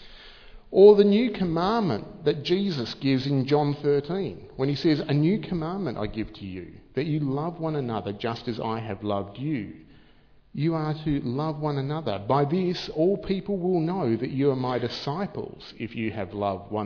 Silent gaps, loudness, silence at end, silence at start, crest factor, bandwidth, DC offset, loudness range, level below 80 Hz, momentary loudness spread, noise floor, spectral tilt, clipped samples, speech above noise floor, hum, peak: none; -26 LUFS; 0 s; 0 s; 22 dB; 5.4 kHz; under 0.1%; 8 LU; -52 dBFS; 9 LU; -55 dBFS; -8 dB/octave; under 0.1%; 30 dB; none; -4 dBFS